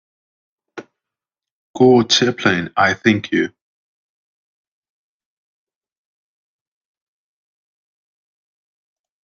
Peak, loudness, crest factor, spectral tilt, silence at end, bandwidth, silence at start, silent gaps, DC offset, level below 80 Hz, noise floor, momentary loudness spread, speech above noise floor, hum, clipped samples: 0 dBFS; -15 LUFS; 22 dB; -4.5 dB/octave; 5.75 s; 7.4 kHz; 0.75 s; 1.51-1.74 s; under 0.1%; -62 dBFS; -88 dBFS; 8 LU; 73 dB; none; under 0.1%